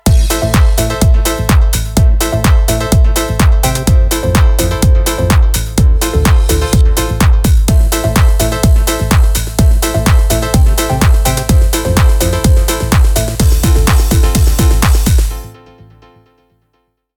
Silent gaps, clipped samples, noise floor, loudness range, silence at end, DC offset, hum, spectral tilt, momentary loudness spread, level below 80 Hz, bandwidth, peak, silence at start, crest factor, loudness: none; under 0.1%; -62 dBFS; 1 LU; 1.7 s; under 0.1%; none; -5 dB/octave; 2 LU; -12 dBFS; 19.5 kHz; 0 dBFS; 0.05 s; 10 dB; -11 LUFS